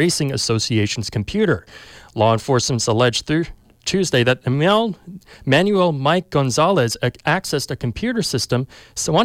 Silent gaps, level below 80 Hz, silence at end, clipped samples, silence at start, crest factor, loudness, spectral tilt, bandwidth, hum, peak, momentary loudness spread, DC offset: none; -46 dBFS; 0 s; under 0.1%; 0 s; 14 dB; -19 LUFS; -4.5 dB/octave; 16 kHz; none; -4 dBFS; 8 LU; under 0.1%